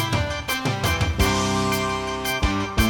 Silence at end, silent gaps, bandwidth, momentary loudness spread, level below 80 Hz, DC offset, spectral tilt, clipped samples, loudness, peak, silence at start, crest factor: 0 s; none; 18 kHz; 4 LU; -32 dBFS; under 0.1%; -4.5 dB/octave; under 0.1%; -23 LUFS; -6 dBFS; 0 s; 16 dB